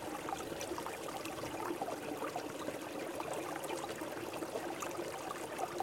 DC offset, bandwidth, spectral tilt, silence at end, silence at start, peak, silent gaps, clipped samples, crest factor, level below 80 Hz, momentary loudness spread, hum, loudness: under 0.1%; 17 kHz; -3.5 dB/octave; 0 s; 0 s; -22 dBFS; none; under 0.1%; 20 dB; -70 dBFS; 2 LU; none; -42 LUFS